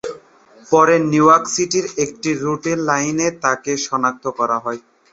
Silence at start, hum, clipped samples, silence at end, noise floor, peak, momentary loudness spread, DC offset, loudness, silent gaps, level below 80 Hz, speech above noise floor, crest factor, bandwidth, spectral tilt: 0.05 s; none; under 0.1%; 0.35 s; -45 dBFS; -2 dBFS; 10 LU; under 0.1%; -17 LUFS; none; -60 dBFS; 28 dB; 16 dB; 8.2 kHz; -4 dB/octave